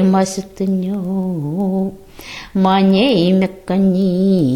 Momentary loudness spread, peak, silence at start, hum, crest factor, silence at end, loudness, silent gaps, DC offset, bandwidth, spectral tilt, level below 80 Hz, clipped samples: 11 LU; -2 dBFS; 0 s; none; 14 dB; 0 s; -16 LUFS; none; under 0.1%; 12 kHz; -7 dB/octave; -46 dBFS; under 0.1%